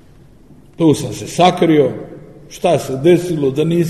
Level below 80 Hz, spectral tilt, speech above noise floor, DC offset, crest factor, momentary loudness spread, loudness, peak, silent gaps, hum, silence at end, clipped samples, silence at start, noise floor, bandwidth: -48 dBFS; -6 dB/octave; 31 dB; 0.3%; 16 dB; 12 LU; -15 LUFS; 0 dBFS; none; none; 0 s; under 0.1%; 0.8 s; -44 dBFS; 13.5 kHz